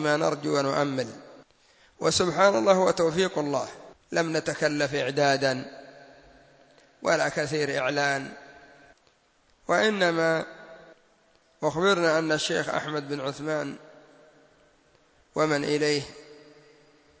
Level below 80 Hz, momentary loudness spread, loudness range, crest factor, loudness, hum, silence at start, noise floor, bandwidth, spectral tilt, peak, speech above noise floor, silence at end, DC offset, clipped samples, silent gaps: -64 dBFS; 15 LU; 6 LU; 22 dB; -26 LUFS; none; 0 s; -64 dBFS; 8 kHz; -4 dB/octave; -6 dBFS; 39 dB; 0.85 s; under 0.1%; under 0.1%; none